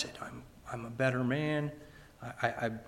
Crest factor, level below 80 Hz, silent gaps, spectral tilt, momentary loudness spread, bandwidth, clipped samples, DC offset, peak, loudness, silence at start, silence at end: 22 dB; -62 dBFS; none; -6.5 dB/octave; 18 LU; 16 kHz; under 0.1%; under 0.1%; -14 dBFS; -34 LUFS; 0 s; 0 s